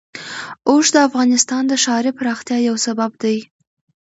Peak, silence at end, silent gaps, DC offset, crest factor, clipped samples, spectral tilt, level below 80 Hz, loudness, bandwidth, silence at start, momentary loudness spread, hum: 0 dBFS; 0.7 s; none; under 0.1%; 18 dB; under 0.1%; -2 dB/octave; -66 dBFS; -16 LUFS; 8 kHz; 0.15 s; 11 LU; none